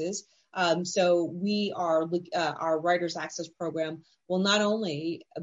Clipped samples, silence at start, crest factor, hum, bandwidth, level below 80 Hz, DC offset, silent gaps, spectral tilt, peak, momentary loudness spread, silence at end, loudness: under 0.1%; 0 s; 16 dB; none; 8.2 kHz; -78 dBFS; under 0.1%; none; -4.5 dB/octave; -12 dBFS; 11 LU; 0 s; -28 LUFS